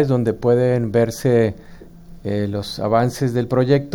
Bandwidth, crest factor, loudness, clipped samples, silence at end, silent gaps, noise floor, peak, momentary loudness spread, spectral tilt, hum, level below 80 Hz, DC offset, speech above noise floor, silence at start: 17.5 kHz; 16 dB; -19 LUFS; under 0.1%; 0 s; none; -39 dBFS; -2 dBFS; 7 LU; -7 dB/octave; none; -46 dBFS; under 0.1%; 21 dB; 0 s